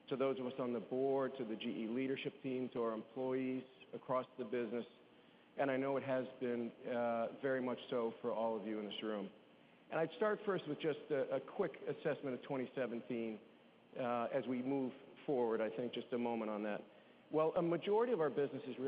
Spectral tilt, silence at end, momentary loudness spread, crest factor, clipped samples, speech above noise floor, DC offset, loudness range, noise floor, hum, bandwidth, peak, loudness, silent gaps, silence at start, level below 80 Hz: -4.5 dB/octave; 0 s; 7 LU; 16 dB; under 0.1%; 26 dB; under 0.1%; 3 LU; -66 dBFS; none; 5 kHz; -24 dBFS; -41 LUFS; none; 0.05 s; -88 dBFS